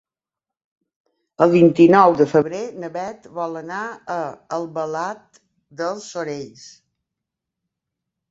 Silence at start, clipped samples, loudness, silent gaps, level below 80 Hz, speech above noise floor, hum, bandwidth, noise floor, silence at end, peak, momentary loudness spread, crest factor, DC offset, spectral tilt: 1.4 s; under 0.1%; -19 LUFS; none; -66 dBFS; 69 dB; none; 7.8 kHz; -88 dBFS; 1.65 s; -2 dBFS; 17 LU; 20 dB; under 0.1%; -7 dB/octave